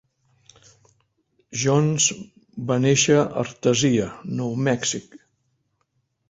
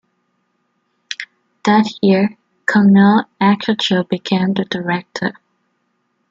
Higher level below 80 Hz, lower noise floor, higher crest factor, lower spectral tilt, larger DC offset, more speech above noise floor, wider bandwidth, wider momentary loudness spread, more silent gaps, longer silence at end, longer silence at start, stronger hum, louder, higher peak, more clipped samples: about the same, -58 dBFS vs -60 dBFS; first, -72 dBFS vs -67 dBFS; about the same, 18 dB vs 16 dB; second, -4 dB/octave vs -6.5 dB/octave; neither; about the same, 51 dB vs 53 dB; about the same, 8.2 kHz vs 7.6 kHz; about the same, 14 LU vs 15 LU; neither; about the same, 1.1 s vs 1 s; first, 1.5 s vs 1.1 s; neither; second, -21 LUFS vs -15 LUFS; second, -6 dBFS vs -2 dBFS; neither